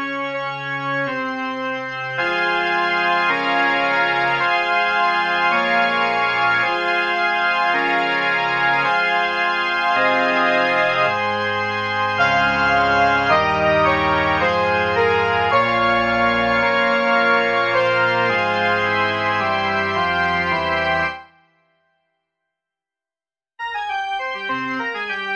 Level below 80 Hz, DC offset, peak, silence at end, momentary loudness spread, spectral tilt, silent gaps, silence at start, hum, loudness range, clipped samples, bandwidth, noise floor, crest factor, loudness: -48 dBFS; under 0.1%; -4 dBFS; 0 s; 8 LU; -5 dB/octave; none; 0 s; none; 7 LU; under 0.1%; 8.8 kHz; under -90 dBFS; 16 dB; -18 LUFS